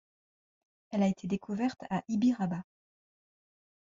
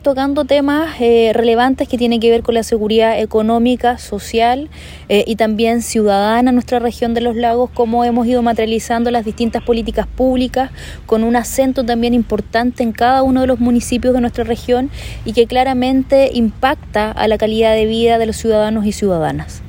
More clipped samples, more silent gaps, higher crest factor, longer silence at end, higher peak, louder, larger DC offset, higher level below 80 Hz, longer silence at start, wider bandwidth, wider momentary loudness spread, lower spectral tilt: neither; neither; about the same, 16 dB vs 14 dB; first, 1.3 s vs 0 s; second, -18 dBFS vs 0 dBFS; second, -32 LUFS vs -14 LUFS; neither; second, -70 dBFS vs -34 dBFS; first, 0.9 s vs 0 s; second, 7.6 kHz vs 16.5 kHz; first, 8 LU vs 5 LU; first, -7 dB/octave vs -5 dB/octave